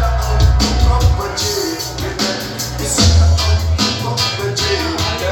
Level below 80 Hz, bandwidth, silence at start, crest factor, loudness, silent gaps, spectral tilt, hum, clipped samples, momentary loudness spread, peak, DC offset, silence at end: -20 dBFS; 17 kHz; 0 s; 14 dB; -15 LUFS; none; -4 dB/octave; none; under 0.1%; 8 LU; 0 dBFS; under 0.1%; 0 s